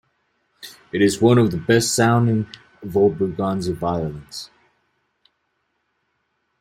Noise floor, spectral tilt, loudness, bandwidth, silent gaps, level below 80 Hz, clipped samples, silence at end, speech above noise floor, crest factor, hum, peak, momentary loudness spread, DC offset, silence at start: -72 dBFS; -5.5 dB/octave; -19 LUFS; 16 kHz; none; -52 dBFS; under 0.1%; 2.15 s; 53 dB; 20 dB; none; -2 dBFS; 21 LU; under 0.1%; 0.6 s